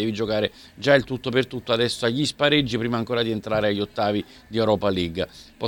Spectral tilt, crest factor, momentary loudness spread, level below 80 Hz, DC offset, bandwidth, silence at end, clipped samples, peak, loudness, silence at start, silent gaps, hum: -5.5 dB/octave; 20 dB; 8 LU; -50 dBFS; under 0.1%; 17 kHz; 0 s; under 0.1%; -2 dBFS; -23 LUFS; 0 s; none; none